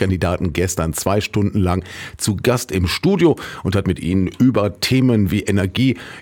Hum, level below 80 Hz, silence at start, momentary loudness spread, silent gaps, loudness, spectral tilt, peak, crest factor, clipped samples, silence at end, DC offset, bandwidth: none; -38 dBFS; 0 s; 6 LU; none; -18 LUFS; -5.5 dB/octave; -2 dBFS; 16 dB; under 0.1%; 0 s; under 0.1%; 18 kHz